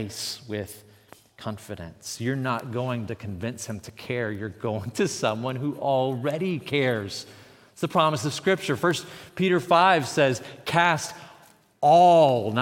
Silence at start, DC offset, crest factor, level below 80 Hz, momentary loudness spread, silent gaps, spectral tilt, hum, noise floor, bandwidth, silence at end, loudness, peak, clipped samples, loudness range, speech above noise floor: 0 s; under 0.1%; 20 dB; -66 dBFS; 18 LU; none; -5 dB/octave; none; -55 dBFS; 17 kHz; 0 s; -24 LUFS; -6 dBFS; under 0.1%; 10 LU; 31 dB